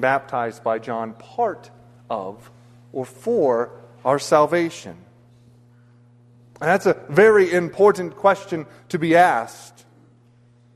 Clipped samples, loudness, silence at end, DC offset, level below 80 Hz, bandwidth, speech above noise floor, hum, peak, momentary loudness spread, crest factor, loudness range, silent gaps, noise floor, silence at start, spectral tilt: under 0.1%; -20 LUFS; 1.1 s; under 0.1%; -64 dBFS; 13.5 kHz; 34 dB; none; -2 dBFS; 16 LU; 20 dB; 8 LU; none; -54 dBFS; 0 s; -5.5 dB/octave